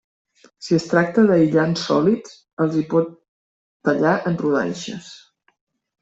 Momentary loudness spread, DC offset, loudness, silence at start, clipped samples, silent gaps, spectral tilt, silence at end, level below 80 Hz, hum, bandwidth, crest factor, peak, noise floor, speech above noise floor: 14 LU; under 0.1%; -19 LUFS; 0.6 s; under 0.1%; 2.53-2.57 s, 3.28-3.80 s; -6.5 dB/octave; 0.85 s; -60 dBFS; none; 8 kHz; 18 dB; -4 dBFS; under -90 dBFS; over 71 dB